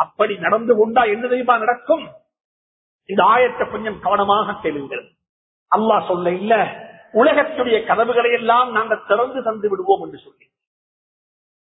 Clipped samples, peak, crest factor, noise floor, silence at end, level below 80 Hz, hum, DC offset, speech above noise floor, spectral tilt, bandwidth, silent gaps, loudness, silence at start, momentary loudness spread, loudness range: under 0.1%; 0 dBFS; 18 dB; under -90 dBFS; 1.45 s; -58 dBFS; none; under 0.1%; over 73 dB; -10 dB/octave; 4 kHz; 2.44-2.99 s, 5.29-5.66 s; -18 LUFS; 0 s; 9 LU; 3 LU